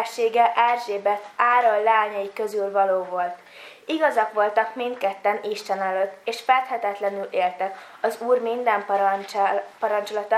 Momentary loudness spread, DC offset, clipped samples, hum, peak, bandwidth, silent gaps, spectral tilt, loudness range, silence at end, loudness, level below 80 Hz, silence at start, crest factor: 9 LU; under 0.1%; under 0.1%; none; -4 dBFS; 15 kHz; none; -3.5 dB/octave; 3 LU; 0 s; -23 LUFS; -82 dBFS; 0 s; 18 dB